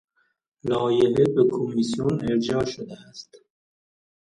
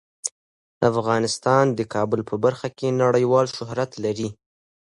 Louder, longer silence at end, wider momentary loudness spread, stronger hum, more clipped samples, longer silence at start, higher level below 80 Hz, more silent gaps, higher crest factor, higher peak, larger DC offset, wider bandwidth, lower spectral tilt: about the same, -23 LUFS vs -22 LUFS; first, 1 s vs 0.55 s; first, 19 LU vs 11 LU; neither; neither; first, 0.65 s vs 0.25 s; about the same, -56 dBFS vs -60 dBFS; second, none vs 0.32-0.81 s; about the same, 18 dB vs 18 dB; about the same, -6 dBFS vs -4 dBFS; neither; about the same, 11 kHz vs 11.5 kHz; about the same, -6.5 dB/octave vs -5.5 dB/octave